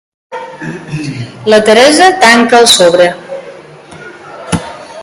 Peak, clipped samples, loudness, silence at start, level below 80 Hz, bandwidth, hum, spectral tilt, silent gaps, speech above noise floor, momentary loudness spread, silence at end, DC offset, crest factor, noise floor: 0 dBFS; 2%; -6 LUFS; 0.3 s; -44 dBFS; 16 kHz; none; -3 dB/octave; none; 25 dB; 22 LU; 0 s; under 0.1%; 10 dB; -32 dBFS